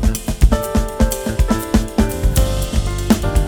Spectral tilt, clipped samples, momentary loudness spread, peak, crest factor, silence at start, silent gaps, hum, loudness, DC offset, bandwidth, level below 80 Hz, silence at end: -5.5 dB/octave; under 0.1%; 4 LU; 0 dBFS; 16 dB; 0 s; none; none; -18 LUFS; under 0.1%; over 20 kHz; -18 dBFS; 0 s